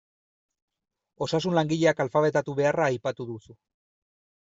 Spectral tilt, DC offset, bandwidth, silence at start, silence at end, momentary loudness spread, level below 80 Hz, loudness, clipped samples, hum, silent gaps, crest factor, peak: -6 dB/octave; under 0.1%; 8 kHz; 1.2 s; 0.9 s; 13 LU; -66 dBFS; -25 LUFS; under 0.1%; none; none; 18 dB; -10 dBFS